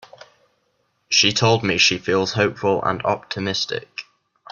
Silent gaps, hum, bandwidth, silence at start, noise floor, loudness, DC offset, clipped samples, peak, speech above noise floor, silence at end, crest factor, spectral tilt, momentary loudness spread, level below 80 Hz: none; none; 10.5 kHz; 1.1 s; -68 dBFS; -19 LUFS; under 0.1%; under 0.1%; -2 dBFS; 48 dB; 0.5 s; 20 dB; -3.5 dB/octave; 10 LU; -56 dBFS